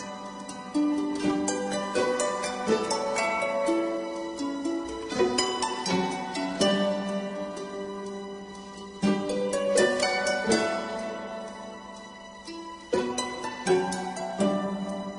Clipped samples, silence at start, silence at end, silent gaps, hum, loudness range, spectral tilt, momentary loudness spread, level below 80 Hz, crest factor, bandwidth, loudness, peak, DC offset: under 0.1%; 0 s; 0 s; none; none; 3 LU; -4 dB/octave; 15 LU; -60 dBFS; 20 dB; 11 kHz; -28 LUFS; -8 dBFS; under 0.1%